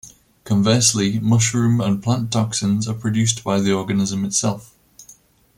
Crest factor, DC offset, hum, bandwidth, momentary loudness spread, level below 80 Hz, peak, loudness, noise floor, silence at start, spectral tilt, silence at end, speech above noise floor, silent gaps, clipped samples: 18 dB; under 0.1%; none; 16 kHz; 6 LU; -54 dBFS; -2 dBFS; -19 LUFS; -50 dBFS; 0.05 s; -4.5 dB/octave; 0.45 s; 32 dB; none; under 0.1%